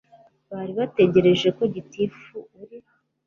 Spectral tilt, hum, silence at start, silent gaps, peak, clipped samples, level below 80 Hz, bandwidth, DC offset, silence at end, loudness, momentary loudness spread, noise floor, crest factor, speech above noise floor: -7 dB/octave; none; 0.5 s; none; -6 dBFS; under 0.1%; -60 dBFS; 7 kHz; under 0.1%; 0.5 s; -21 LUFS; 23 LU; -47 dBFS; 18 dB; 25 dB